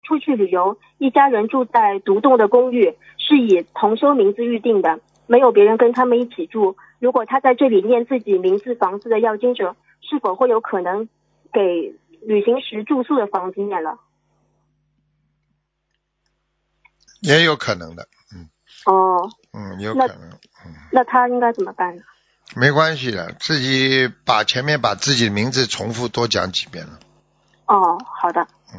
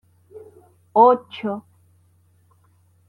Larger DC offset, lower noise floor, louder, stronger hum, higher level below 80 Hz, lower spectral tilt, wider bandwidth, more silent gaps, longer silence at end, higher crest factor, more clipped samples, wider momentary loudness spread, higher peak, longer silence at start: neither; first, -73 dBFS vs -58 dBFS; about the same, -17 LUFS vs -18 LUFS; neither; first, -58 dBFS vs -74 dBFS; second, -5 dB/octave vs -7.5 dB/octave; first, 7.8 kHz vs 5.2 kHz; neither; second, 0 s vs 1.5 s; about the same, 18 dB vs 20 dB; neither; second, 11 LU vs 15 LU; first, 0 dBFS vs -4 dBFS; second, 0.05 s vs 0.35 s